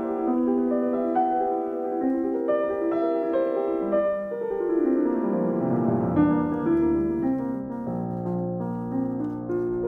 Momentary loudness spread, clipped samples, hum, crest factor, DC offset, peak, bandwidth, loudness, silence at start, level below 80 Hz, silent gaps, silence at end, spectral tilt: 7 LU; under 0.1%; none; 16 dB; under 0.1%; -10 dBFS; 4 kHz; -25 LUFS; 0 s; -54 dBFS; none; 0 s; -11 dB/octave